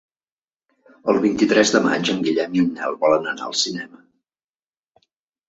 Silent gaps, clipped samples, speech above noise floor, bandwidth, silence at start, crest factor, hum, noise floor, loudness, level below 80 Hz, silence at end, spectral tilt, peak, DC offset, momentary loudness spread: none; under 0.1%; over 71 dB; 8.2 kHz; 1.05 s; 20 dB; none; under -90 dBFS; -19 LUFS; -62 dBFS; 1.6 s; -4 dB/octave; -2 dBFS; under 0.1%; 8 LU